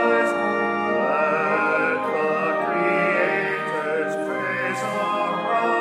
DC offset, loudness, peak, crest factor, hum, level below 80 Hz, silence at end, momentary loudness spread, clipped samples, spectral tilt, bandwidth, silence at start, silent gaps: under 0.1%; -22 LUFS; -8 dBFS; 14 dB; none; -80 dBFS; 0 s; 5 LU; under 0.1%; -5.5 dB/octave; 14 kHz; 0 s; none